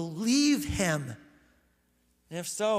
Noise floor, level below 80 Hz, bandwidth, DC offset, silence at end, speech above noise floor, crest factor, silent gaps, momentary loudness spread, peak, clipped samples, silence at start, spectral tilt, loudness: -70 dBFS; -54 dBFS; 15.5 kHz; under 0.1%; 0 s; 41 dB; 16 dB; none; 18 LU; -14 dBFS; under 0.1%; 0 s; -4 dB/octave; -28 LUFS